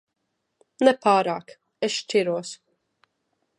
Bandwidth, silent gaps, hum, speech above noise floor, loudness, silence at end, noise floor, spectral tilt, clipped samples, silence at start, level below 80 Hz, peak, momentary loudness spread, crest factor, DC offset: 11 kHz; none; none; 53 dB; -23 LUFS; 1.05 s; -75 dBFS; -4 dB/octave; under 0.1%; 0.8 s; -78 dBFS; -4 dBFS; 14 LU; 22 dB; under 0.1%